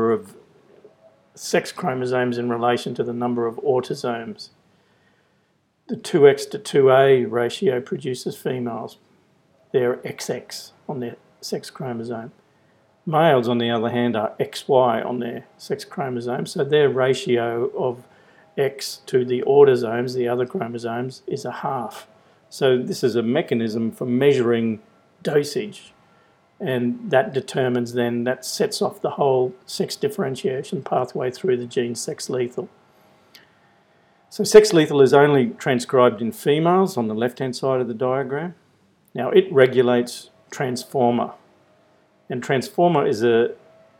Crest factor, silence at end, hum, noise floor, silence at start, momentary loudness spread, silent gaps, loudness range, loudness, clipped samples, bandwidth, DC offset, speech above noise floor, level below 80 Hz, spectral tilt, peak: 22 dB; 0.45 s; none; -65 dBFS; 0 s; 15 LU; none; 8 LU; -21 LUFS; under 0.1%; 16 kHz; under 0.1%; 45 dB; -66 dBFS; -5.5 dB/octave; 0 dBFS